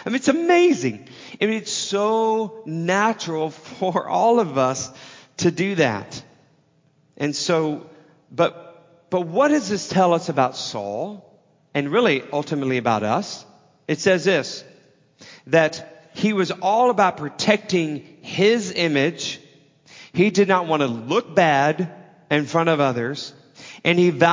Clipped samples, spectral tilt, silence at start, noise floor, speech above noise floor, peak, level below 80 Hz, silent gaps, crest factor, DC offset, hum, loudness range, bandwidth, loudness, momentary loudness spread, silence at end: under 0.1%; -5 dB/octave; 0 s; -60 dBFS; 40 dB; -2 dBFS; -66 dBFS; none; 20 dB; under 0.1%; none; 4 LU; 7.6 kHz; -21 LUFS; 13 LU; 0 s